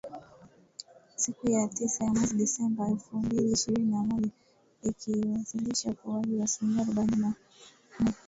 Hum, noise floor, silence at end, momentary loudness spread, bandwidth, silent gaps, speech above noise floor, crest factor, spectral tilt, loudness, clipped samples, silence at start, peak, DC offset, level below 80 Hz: none; -57 dBFS; 0.15 s; 14 LU; 8 kHz; none; 28 dB; 14 dB; -4.5 dB/octave; -30 LUFS; under 0.1%; 0.05 s; -16 dBFS; under 0.1%; -58 dBFS